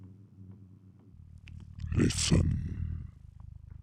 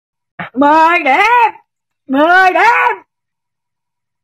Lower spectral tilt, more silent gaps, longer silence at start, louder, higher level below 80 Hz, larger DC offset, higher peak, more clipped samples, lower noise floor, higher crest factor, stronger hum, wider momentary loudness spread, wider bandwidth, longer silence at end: first, -5 dB/octave vs -3.5 dB/octave; neither; second, 0 s vs 0.4 s; second, -31 LUFS vs -10 LUFS; first, -44 dBFS vs -58 dBFS; neither; second, -14 dBFS vs -2 dBFS; neither; second, -55 dBFS vs -81 dBFS; first, 20 dB vs 12 dB; neither; first, 26 LU vs 13 LU; first, over 20 kHz vs 14 kHz; second, 0.05 s vs 1.25 s